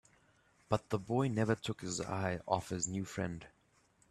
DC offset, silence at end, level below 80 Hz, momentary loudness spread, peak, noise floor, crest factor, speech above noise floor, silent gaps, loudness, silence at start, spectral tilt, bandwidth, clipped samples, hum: under 0.1%; 0.65 s; -66 dBFS; 6 LU; -14 dBFS; -71 dBFS; 24 dB; 35 dB; none; -37 LUFS; 0.7 s; -5 dB/octave; 13 kHz; under 0.1%; none